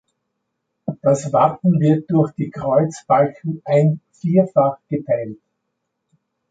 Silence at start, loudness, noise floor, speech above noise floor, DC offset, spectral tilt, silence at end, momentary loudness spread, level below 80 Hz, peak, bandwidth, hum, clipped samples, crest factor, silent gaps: 0.85 s; -18 LUFS; -75 dBFS; 58 dB; under 0.1%; -8.5 dB/octave; 1.15 s; 10 LU; -60 dBFS; -2 dBFS; 9 kHz; none; under 0.1%; 16 dB; none